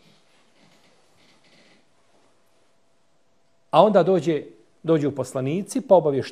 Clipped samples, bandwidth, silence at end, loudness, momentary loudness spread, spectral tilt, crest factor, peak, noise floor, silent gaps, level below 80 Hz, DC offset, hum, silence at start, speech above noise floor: under 0.1%; 14.5 kHz; 0 s; -21 LUFS; 11 LU; -6.5 dB/octave; 22 dB; -2 dBFS; -67 dBFS; none; -70 dBFS; under 0.1%; none; 3.75 s; 47 dB